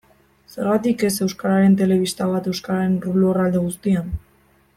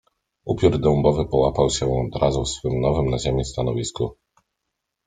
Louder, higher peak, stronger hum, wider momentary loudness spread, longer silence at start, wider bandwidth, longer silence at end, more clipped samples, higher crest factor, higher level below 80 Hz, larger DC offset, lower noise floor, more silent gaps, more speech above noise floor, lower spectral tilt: about the same, -20 LUFS vs -22 LUFS; about the same, -6 dBFS vs -4 dBFS; neither; about the same, 8 LU vs 9 LU; about the same, 0.55 s vs 0.45 s; first, 15.5 kHz vs 9.6 kHz; second, 0.6 s vs 0.95 s; neither; about the same, 14 dB vs 18 dB; second, -44 dBFS vs -36 dBFS; neither; second, -57 dBFS vs -80 dBFS; neither; second, 38 dB vs 59 dB; about the same, -6.5 dB/octave vs -6 dB/octave